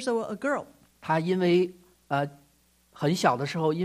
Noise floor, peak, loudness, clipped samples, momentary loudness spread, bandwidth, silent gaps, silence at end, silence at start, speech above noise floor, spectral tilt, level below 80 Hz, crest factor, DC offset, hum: -64 dBFS; -6 dBFS; -27 LUFS; under 0.1%; 9 LU; 15 kHz; none; 0 s; 0 s; 38 dB; -6 dB/octave; -68 dBFS; 22 dB; under 0.1%; 60 Hz at -50 dBFS